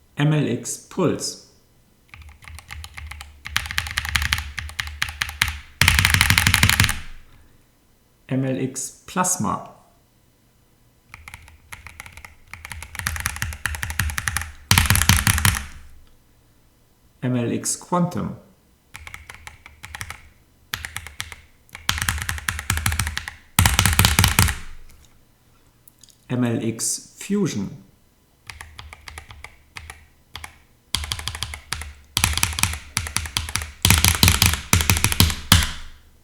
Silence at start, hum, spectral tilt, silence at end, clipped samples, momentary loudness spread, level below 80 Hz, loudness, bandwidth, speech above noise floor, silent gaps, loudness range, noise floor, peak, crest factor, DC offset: 0.15 s; none; -3 dB/octave; 0.25 s; under 0.1%; 24 LU; -36 dBFS; -21 LUFS; over 20 kHz; 35 dB; none; 14 LU; -58 dBFS; 0 dBFS; 24 dB; under 0.1%